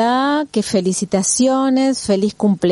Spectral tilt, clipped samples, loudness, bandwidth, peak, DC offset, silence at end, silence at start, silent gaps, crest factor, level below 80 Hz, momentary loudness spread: -4.5 dB/octave; under 0.1%; -16 LUFS; 11.5 kHz; -2 dBFS; under 0.1%; 0 s; 0 s; none; 14 dB; -54 dBFS; 4 LU